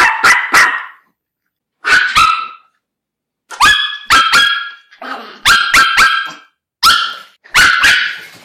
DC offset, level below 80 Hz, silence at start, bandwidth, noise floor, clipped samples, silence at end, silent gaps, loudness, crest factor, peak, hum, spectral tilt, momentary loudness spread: under 0.1%; -42 dBFS; 0 s; 17 kHz; -79 dBFS; under 0.1%; 0.15 s; none; -9 LUFS; 12 dB; -2 dBFS; none; 0.5 dB/octave; 19 LU